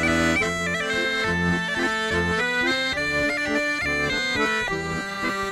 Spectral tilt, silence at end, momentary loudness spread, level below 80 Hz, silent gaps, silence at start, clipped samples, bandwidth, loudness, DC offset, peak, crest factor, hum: -4 dB/octave; 0 s; 4 LU; -44 dBFS; none; 0 s; under 0.1%; 16 kHz; -23 LUFS; under 0.1%; -10 dBFS; 14 dB; none